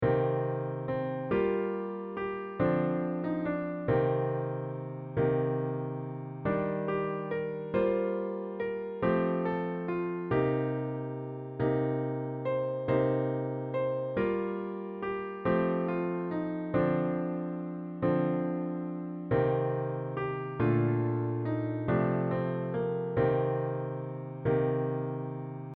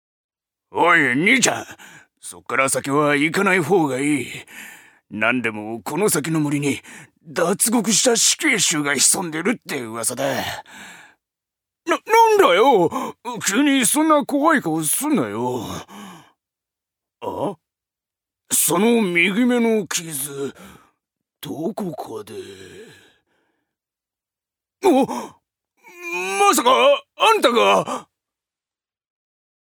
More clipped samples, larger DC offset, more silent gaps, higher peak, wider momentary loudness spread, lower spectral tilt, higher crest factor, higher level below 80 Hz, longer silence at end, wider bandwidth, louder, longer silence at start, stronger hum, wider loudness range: neither; neither; neither; second, -16 dBFS vs 0 dBFS; second, 8 LU vs 19 LU; first, -8 dB/octave vs -3 dB/octave; about the same, 16 dB vs 20 dB; first, -58 dBFS vs -68 dBFS; second, 0.05 s vs 1.6 s; second, 4.4 kHz vs over 20 kHz; second, -32 LUFS vs -18 LUFS; second, 0 s vs 0.75 s; neither; second, 2 LU vs 11 LU